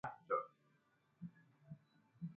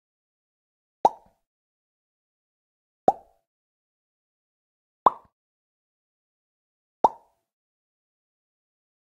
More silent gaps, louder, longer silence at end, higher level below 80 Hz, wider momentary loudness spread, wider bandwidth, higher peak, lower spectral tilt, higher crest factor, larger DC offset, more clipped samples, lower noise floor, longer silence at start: second, none vs 1.47-3.07 s, 3.47-5.06 s, 5.33-7.04 s; second, -47 LUFS vs -25 LUFS; second, 0 s vs 1.95 s; second, -84 dBFS vs -68 dBFS; first, 18 LU vs 2 LU; second, 5 kHz vs 10.5 kHz; second, -26 dBFS vs -4 dBFS; first, -7.5 dB/octave vs -6 dB/octave; second, 24 dB vs 30 dB; neither; neither; second, -78 dBFS vs under -90 dBFS; second, 0.05 s vs 1.05 s